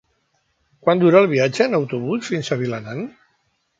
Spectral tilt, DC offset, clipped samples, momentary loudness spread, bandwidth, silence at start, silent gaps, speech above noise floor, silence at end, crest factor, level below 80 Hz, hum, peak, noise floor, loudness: -6.5 dB/octave; under 0.1%; under 0.1%; 15 LU; 9.2 kHz; 0.85 s; none; 49 dB; 0.7 s; 18 dB; -64 dBFS; none; -2 dBFS; -67 dBFS; -18 LUFS